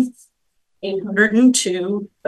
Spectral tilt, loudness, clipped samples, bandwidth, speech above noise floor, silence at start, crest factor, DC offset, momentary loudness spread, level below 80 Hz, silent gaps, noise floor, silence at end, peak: -3.5 dB/octave; -17 LUFS; under 0.1%; 12.5 kHz; 50 dB; 0 s; 18 dB; under 0.1%; 13 LU; -66 dBFS; none; -67 dBFS; 0.2 s; 0 dBFS